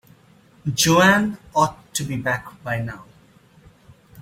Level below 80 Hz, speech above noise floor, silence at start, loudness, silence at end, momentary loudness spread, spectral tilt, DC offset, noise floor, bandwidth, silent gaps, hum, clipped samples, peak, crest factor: -52 dBFS; 33 dB; 0.65 s; -20 LUFS; 0 s; 15 LU; -4 dB/octave; under 0.1%; -53 dBFS; 16.5 kHz; none; none; under 0.1%; -2 dBFS; 20 dB